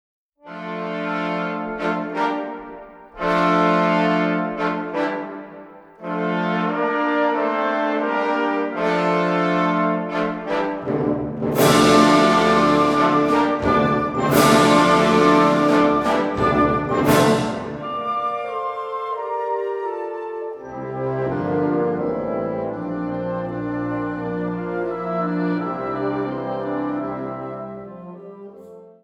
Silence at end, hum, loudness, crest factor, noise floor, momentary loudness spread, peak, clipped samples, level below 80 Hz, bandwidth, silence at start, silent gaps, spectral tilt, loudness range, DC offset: 0.1 s; none; -20 LUFS; 18 dB; -42 dBFS; 15 LU; -2 dBFS; under 0.1%; -48 dBFS; 19 kHz; 0.45 s; none; -5.5 dB/octave; 9 LU; under 0.1%